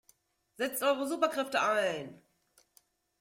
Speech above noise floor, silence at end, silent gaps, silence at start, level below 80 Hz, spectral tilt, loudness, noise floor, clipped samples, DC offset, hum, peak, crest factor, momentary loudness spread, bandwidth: 39 dB; 1.05 s; none; 0.6 s; -80 dBFS; -3 dB/octave; -31 LUFS; -70 dBFS; under 0.1%; under 0.1%; none; -14 dBFS; 20 dB; 9 LU; 16.5 kHz